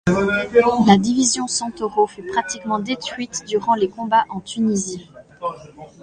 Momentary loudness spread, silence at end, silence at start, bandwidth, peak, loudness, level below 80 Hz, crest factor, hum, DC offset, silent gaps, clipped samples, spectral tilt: 15 LU; 0.15 s; 0.05 s; 10 kHz; 0 dBFS; -19 LUFS; -50 dBFS; 20 dB; none; under 0.1%; none; under 0.1%; -4 dB/octave